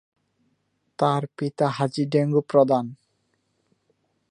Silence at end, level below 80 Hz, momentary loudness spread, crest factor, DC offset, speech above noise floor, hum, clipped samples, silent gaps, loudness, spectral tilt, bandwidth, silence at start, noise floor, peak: 1.35 s; -74 dBFS; 7 LU; 20 dB; under 0.1%; 50 dB; none; under 0.1%; none; -23 LUFS; -7.5 dB/octave; 10.5 kHz; 1 s; -71 dBFS; -4 dBFS